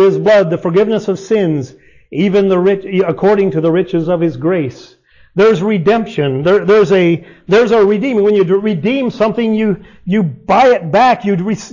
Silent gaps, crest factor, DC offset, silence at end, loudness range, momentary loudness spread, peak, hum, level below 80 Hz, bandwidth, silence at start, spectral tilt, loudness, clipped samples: none; 10 dB; under 0.1%; 0.05 s; 2 LU; 7 LU; -2 dBFS; none; -48 dBFS; 7.4 kHz; 0 s; -7 dB/octave; -12 LUFS; under 0.1%